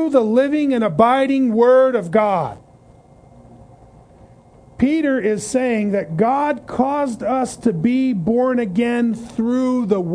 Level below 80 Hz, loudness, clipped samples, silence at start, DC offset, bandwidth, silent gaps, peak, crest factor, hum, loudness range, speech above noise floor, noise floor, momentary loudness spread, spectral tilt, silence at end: -52 dBFS; -18 LUFS; under 0.1%; 0 s; under 0.1%; 10.5 kHz; none; 0 dBFS; 18 dB; none; 6 LU; 30 dB; -47 dBFS; 7 LU; -6.5 dB/octave; 0 s